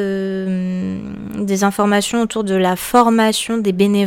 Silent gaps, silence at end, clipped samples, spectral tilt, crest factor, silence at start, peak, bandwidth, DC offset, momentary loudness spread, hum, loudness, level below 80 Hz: none; 0 s; under 0.1%; -5 dB/octave; 16 dB; 0 s; 0 dBFS; 17.5 kHz; under 0.1%; 10 LU; none; -17 LUFS; -50 dBFS